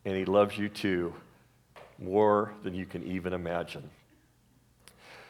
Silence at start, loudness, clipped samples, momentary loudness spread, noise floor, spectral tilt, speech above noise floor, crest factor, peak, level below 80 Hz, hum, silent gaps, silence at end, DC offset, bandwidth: 0.05 s; -30 LUFS; under 0.1%; 17 LU; -65 dBFS; -7 dB/octave; 35 dB; 20 dB; -12 dBFS; -64 dBFS; none; none; 0.05 s; under 0.1%; 14.5 kHz